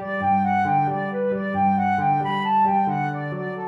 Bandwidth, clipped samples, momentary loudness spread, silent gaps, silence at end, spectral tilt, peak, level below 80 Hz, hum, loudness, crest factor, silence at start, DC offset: 6.2 kHz; under 0.1%; 5 LU; none; 0 s; -8.5 dB/octave; -12 dBFS; -62 dBFS; none; -22 LUFS; 10 dB; 0 s; under 0.1%